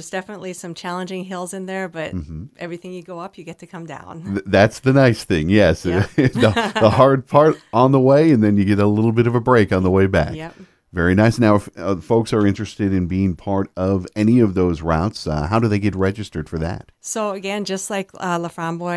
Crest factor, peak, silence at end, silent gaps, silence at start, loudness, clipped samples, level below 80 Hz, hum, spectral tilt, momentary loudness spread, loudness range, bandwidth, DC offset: 18 dB; 0 dBFS; 0 s; none; 0 s; -18 LUFS; under 0.1%; -42 dBFS; none; -6.5 dB/octave; 17 LU; 11 LU; 11 kHz; under 0.1%